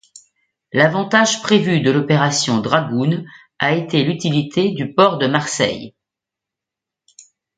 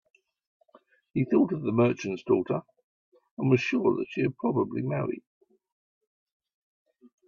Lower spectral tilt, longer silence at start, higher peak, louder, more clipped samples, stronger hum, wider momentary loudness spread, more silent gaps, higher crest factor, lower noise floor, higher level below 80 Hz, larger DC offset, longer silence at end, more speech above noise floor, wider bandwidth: second, -4.5 dB/octave vs -8 dB/octave; second, 0.75 s vs 1.15 s; first, 0 dBFS vs -10 dBFS; first, -17 LUFS vs -27 LUFS; neither; neither; second, 6 LU vs 9 LU; second, none vs 2.84-3.12 s, 3.31-3.37 s; about the same, 18 dB vs 20 dB; first, -85 dBFS vs -62 dBFS; first, -58 dBFS vs -68 dBFS; neither; second, 1.7 s vs 2.1 s; first, 69 dB vs 35 dB; first, 9.6 kHz vs 7.2 kHz